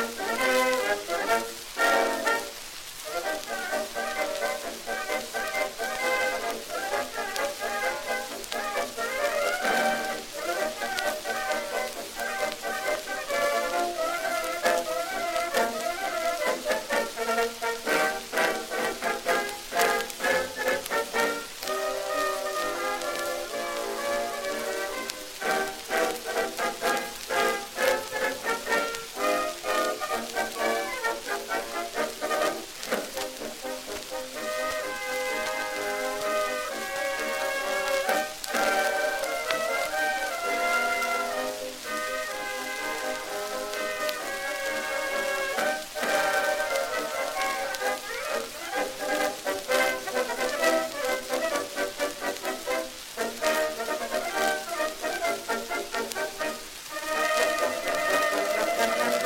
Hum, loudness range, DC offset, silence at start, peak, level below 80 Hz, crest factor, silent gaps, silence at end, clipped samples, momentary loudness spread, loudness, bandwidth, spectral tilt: none; 3 LU; under 0.1%; 0 s; -4 dBFS; -58 dBFS; 24 dB; none; 0 s; under 0.1%; 7 LU; -28 LUFS; 17 kHz; -1 dB/octave